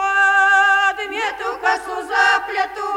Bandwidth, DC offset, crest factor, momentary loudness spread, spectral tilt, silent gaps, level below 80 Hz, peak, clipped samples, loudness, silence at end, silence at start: 16 kHz; under 0.1%; 14 dB; 10 LU; 0 dB/octave; none; -56 dBFS; -4 dBFS; under 0.1%; -16 LUFS; 0 s; 0 s